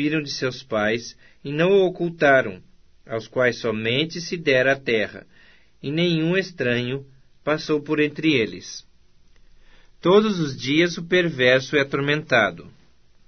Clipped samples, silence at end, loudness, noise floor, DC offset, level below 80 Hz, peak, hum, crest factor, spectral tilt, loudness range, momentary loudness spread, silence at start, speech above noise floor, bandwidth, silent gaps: under 0.1%; 0.6 s; -21 LUFS; -57 dBFS; 0.2%; -56 dBFS; -4 dBFS; none; 20 dB; -5.5 dB/octave; 4 LU; 14 LU; 0 s; 35 dB; 6.6 kHz; none